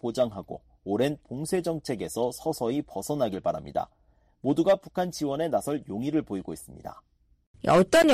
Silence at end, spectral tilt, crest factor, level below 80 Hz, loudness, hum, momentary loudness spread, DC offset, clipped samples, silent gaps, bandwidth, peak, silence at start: 0 s; -5.5 dB/octave; 16 dB; -56 dBFS; -28 LUFS; none; 17 LU; under 0.1%; under 0.1%; 7.47-7.54 s; 15.5 kHz; -12 dBFS; 0.05 s